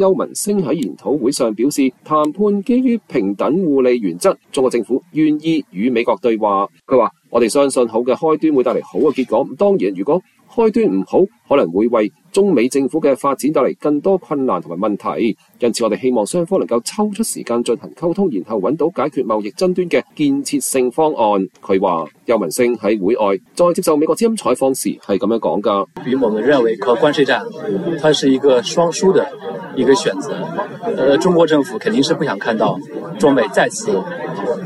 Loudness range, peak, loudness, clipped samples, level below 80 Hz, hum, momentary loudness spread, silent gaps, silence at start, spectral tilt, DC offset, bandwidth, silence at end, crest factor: 3 LU; -2 dBFS; -16 LUFS; under 0.1%; -58 dBFS; none; 6 LU; none; 0 s; -5 dB/octave; under 0.1%; 14.5 kHz; 0 s; 14 dB